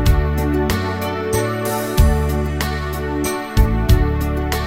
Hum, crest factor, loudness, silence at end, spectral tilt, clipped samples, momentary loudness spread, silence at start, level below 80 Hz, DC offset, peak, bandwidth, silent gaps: none; 16 dB; -19 LUFS; 0 s; -6 dB/octave; under 0.1%; 6 LU; 0 s; -20 dBFS; under 0.1%; -2 dBFS; 16.5 kHz; none